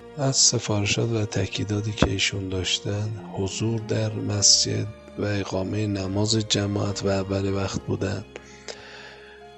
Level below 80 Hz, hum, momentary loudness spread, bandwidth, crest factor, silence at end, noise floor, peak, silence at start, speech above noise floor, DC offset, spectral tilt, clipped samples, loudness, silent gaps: -46 dBFS; none; 17 LU; 8.6 kHz; 26 dB; 0 s; -45 dBFS; 0 dBFS; 0 s; 20 dB; under 0.1%; -3.5 dB/octave; under 0.1%; -23 LUFS; none